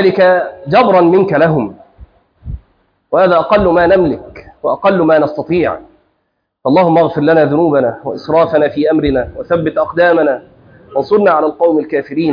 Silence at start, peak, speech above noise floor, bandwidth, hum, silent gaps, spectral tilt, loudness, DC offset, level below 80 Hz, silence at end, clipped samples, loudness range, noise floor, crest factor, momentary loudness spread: 0 s; 0 dBFS; 55 dB; 5.2 kHz; none; none; -9 dB/octave; -12 LUFS; under 0.1%; -38 dBFS; 0 s; under 0.1%; 2 LU; -66 dBFS; 12 dB; 12 LU